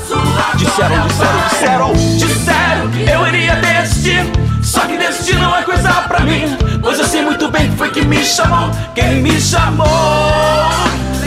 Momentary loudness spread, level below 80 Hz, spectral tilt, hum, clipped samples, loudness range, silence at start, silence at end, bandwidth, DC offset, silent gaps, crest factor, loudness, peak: 3 LU; -24 dBFS; -4.5 dB/octave; none; under 0.1%; 1 LU; 0 s; 0 s; 16 kHz; under 0.1%; none; 12 dB; -12 LUFS; 0 dBFS